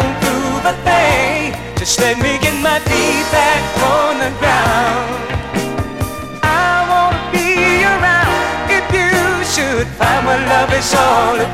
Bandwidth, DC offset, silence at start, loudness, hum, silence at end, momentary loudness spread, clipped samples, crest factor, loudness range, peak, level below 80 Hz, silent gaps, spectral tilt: 16.5 kHz; under 0.1%; 0 s; -13 LUFS; none; 0 s; 8 LU; under 0.1%; 14 dB; 2 LU; 0 dBFS; -32 dBFS; none; -3.5 dB/octave